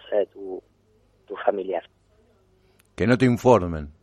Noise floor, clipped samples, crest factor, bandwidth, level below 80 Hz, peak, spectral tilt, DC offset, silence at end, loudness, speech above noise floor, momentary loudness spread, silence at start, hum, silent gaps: -62 dBFS; under 0.1%; 22 dB; 13 kHz; -50 dBFS; -2 dBFS; -7.5 dB/octave; under 0.1%; 0.1 s; -22 LUFS; 41 dB; 18 LU; 0.05 s; none; none